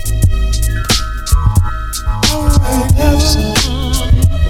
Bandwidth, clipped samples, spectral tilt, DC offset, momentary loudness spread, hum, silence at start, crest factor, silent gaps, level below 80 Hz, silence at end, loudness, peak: 17 kHz; under 0.1%; -4.5 dB/octave; under 0.1%; 5 LU; none; 0 s; 12 dB; none; -14 dBFS; 0 s; -13 LUFS; 0 dBFS